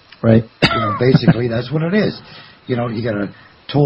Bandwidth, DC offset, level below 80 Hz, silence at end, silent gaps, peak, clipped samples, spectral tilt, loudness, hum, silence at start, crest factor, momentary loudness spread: 8.8 kHz; under 0.1%; -44 dBFS; 0 s; none; 0 dBFS; under 0.1%; -8 dB/octave; -16 LUFS; none; 0.25 s; 16 dB; 13 LU